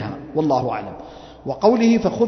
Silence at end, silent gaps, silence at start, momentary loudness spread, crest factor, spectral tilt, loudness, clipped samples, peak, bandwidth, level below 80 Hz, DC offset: 0 s; none; 0 s; 19 LU; 16 dB; -7 dB/octave; -19 LUFS; under 0.1%; -2 dBFS; 6.4 kHz; -50 dBFS; under 0.1%